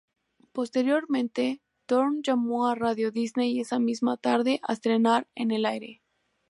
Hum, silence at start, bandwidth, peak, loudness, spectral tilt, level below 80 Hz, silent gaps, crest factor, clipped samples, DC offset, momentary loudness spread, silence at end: none; 0.55 s; 11.5 kHz; -10 dBFS; -26 LUFS; -5 dB/octave; -76 dBFS; none; 18 dB; under 0.1%; under 0.1%; 6 LU; 0.55 s